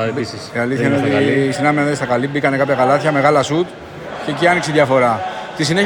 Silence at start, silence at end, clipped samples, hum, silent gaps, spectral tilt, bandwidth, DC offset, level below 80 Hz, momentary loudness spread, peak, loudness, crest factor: 0 s; 0 s; under 0.1%; none; none; -5.5 dB/octave; 17.5 kHz; under 0.1%; -52 dBFS; 10 LU; 0 dBFS; -16 LUFS; 16 dB